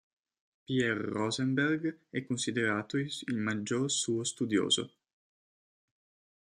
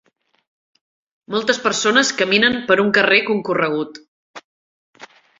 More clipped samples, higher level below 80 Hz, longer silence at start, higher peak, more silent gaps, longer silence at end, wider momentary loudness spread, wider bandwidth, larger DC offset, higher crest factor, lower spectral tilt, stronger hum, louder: neither; second, -74 dBFS vs -60 dBFS; second, 0.7 s vs 1.3 s; second, -14 dBFS vs -2 dBFS; second, none vs 4.08-4.34 s, 4.44-4.93 s; first, 1.55 s vs 0.35 s; second, 6 LU vs 9 LU; first, 12.5 kHz vs 7.8 kHz; neither; about the same, 20 dB vs 18 dB; about the same, -4 dB/octave vs -3 dB/octave; neither; second, -32 LUFS vs -16 LUFS